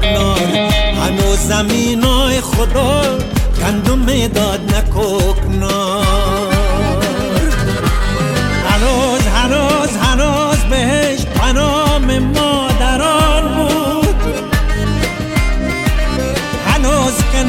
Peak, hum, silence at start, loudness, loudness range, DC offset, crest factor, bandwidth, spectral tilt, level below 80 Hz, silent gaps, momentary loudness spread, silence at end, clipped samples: 0 dBFS; none; 0 s; -14 LUFS; 2 LU; under 0.1%; 12 dB; 17 kHz; -4.5 dB/octave; -18 dBFS; none; 4 LU; 0 s; under 0.1%